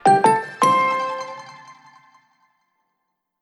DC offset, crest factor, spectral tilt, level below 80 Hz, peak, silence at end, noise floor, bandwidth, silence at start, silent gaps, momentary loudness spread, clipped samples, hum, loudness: under 0.1%; 18 dB; -4 dB/octave; -82 dBFS; -2 dBFS; 1.7 s; -76 dBFS; 12.5 kHz; 0.05 s; none; 20 LU; under 0.1%; none; -18 LUFS